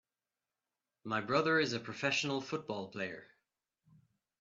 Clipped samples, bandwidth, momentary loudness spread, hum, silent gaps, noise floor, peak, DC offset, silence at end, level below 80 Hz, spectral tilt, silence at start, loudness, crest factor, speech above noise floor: under 0.1%; 8 kHz; 12 LU; none; none; under -90 dBFS; -16 dBFS; under 0.1%; 1.15 s; -80 dBFS; -4 dB/octave; 1.05 s; -35 LUFS; 22 dB; over 55 dB